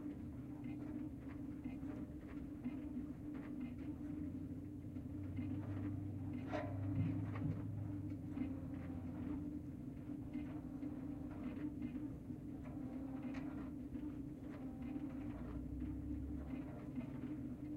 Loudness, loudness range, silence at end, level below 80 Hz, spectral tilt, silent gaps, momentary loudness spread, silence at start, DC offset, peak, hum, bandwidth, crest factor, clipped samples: -47 LUFS; 4 LU; 0 s; -58 dBFS; -9.5 dB/octave; none; 6 LU; 0 s; under 0.1%; -28 dBFS; none; 15.5 kHz; 18 dB; under 0.1%